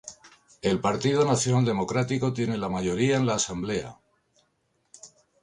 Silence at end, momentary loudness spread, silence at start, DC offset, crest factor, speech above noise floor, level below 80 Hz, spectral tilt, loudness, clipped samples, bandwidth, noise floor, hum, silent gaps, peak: 0.35 s; 8 LU; 0.05 s; under 0.1%; 18 dB; 47 dB; -56 dBFS; -5 dB/octave; -26 LUFS; under 0.1%; 11.5 kHz; -72 dBFS; none; none; -10 dBFS